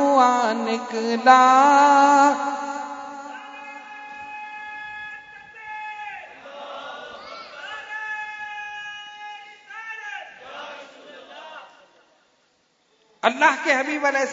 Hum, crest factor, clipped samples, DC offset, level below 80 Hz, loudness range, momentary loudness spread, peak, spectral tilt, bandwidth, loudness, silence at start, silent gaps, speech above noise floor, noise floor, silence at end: none; 22 dB; under 0.1%; under 0.1%; -74 dBFS; 20 LU; 25 LU; 0 dBFS; -2.5 dB/octave; 7.8 kHz; -19 LUFS; 0 s; none; 48 dB; -65 dBFS; 0 s